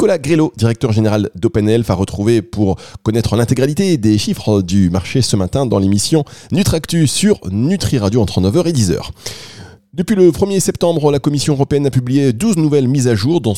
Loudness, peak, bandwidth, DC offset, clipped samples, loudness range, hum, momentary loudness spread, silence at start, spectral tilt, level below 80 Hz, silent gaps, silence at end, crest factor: -14 LUFS; 0 dBFS; 16 kHz; 0.8%; under 0.1%; 1 LU; none; 5 LU; 0 s; -6 dB/octave; -40 dBFS; none; 0 s; 14 dB